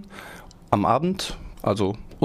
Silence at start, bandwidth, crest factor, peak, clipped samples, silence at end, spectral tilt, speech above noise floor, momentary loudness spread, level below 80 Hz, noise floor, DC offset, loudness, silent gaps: 0 s; 15.5 kHz; 22 dB; -2 dBFS; under 0.1%; 0 s; -6 dB/octave; 20 dB; 20 LU; -44 dBFS; -43 dBFS; under 0.1%; -24 LUFS; none